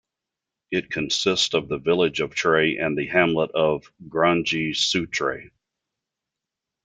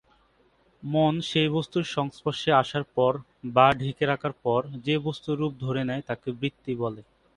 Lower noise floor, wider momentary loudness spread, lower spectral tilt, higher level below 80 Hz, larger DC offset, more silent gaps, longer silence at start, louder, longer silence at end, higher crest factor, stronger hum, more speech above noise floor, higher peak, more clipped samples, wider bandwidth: first, -86 dBFS vs -64 dBFS; about the same, 8 LU vs 10 LU; second, -4 dB/octave vs -6.5 dB/octave; about the same, -58 dBFS vs -60 dBFS; neither; neither; second, 0.7 s vs 0.85 s; first, -22 LUFS vs -26 LUFS; first, 1.4 s vs 0.35 s; about the same, 22 dB vs 22 dB; neither; first, 64 dB vs 38 dB; about the same, -2 dBFS vs -4 dBFS; neither; second, 9.4 kHz vs 11 kHz